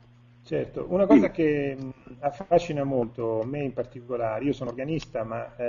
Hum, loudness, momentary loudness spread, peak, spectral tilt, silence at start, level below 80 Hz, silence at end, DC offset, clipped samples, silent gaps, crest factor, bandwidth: none; -26 LUFS; 13 LU; -6 dBFS; -7 dB/octave; 0.45 s; -54 dBFS; 0 s; under 0.1%; under 0.1%; none; 20 dB; 7.2 kHz